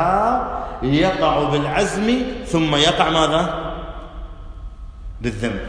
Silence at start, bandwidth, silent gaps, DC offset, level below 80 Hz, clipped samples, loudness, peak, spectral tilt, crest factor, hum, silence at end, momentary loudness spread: 0 s; 10.5 kHz; none; under 0.1%; -34 dBFS; under 0.1%; -19 LUFS; -2 dBFS; -5 dB/octave; 18 dB; none; 0 s; 22 LU